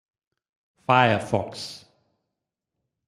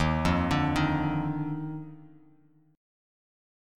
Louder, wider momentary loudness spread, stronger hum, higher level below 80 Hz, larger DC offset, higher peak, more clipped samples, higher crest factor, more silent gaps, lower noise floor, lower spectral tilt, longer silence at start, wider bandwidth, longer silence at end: first, -22 LUFS vs -28 LUFS; first, 18 LU vs 13 LU; neither; second, -64 dBFS vs -44 dBFS; neither; first, -4 dBFS vs -12 dBFS; neither; first, 24 dB vs 18 dB; neither; first, -84 dBFS vs -61 dBFS; about the same, -5.5 dB/octave vs -6.5 dB/octave; first, 0.9 s vs 0 s; about the same, 13.5 kHz vs 12.5 kHz; first, 1.3 s vs 1 s